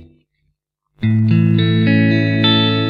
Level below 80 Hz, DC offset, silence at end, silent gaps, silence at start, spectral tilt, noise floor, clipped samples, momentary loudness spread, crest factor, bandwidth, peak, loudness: -48 dBFS; under 0.1%; 0 s; none; 0 s; -8.5 dB/octave; -69 dBFS; under 0.1%; 4 LU; 12 dB; 5.2 kHz; -2 dBFS; -14 LUFS